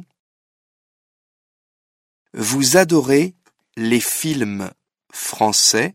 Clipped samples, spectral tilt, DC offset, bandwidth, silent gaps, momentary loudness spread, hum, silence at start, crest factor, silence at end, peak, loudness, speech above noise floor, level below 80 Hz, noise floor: under 0.1%; -3 dB/octave; under 0.1%; 16.5 kHz; none; 16 LU; none; 2.35 s; 20 dB; 0.05 s; 0 dBFS; -17 LUFS; over 73 dB; -62 dBFS; under -90 dBFS